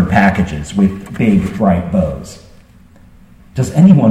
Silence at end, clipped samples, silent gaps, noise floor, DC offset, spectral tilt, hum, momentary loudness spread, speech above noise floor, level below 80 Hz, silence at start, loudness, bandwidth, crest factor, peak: 0 s; under 0.1%; none; -42 dBFS; under 0.1%; -8 dB/octave; none; 13 LU; 30 dB; -34 dBFS; 0 s; -13 LUFS; 11.5 kHz; 14 dB; 0 dBFS